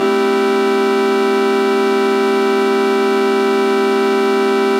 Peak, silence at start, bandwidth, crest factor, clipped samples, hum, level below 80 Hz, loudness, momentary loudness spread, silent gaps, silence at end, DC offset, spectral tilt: -4 dBFS; 0 s; 15.5 kHz; 10 dB; under 0.1%; none; -84 dBFS; -14 LUFS; 0 LU; none; 0 s; under 0.1%; -4.5 dB/octave